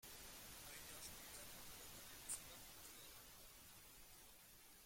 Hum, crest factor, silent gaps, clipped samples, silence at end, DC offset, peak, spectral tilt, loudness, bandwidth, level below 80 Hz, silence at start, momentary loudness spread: none; 24 dB; none; under 0.1%; 0 s; under 0.1%; -34 dBFS; -1 dB/octave; -56 LUFS; 16.5 kHz; -72 dBFS; 0 s; 11 LU